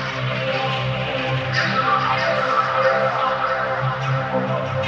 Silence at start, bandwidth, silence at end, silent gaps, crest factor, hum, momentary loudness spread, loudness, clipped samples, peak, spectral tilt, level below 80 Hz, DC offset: 0 s; 7.6 kHz; 0 s; none; 14 dB; none; 4 LU; -20 LUFS; under 0.1%; -6 dBFS; -5.5 dB/octave; -50 dBFS; under 0.1%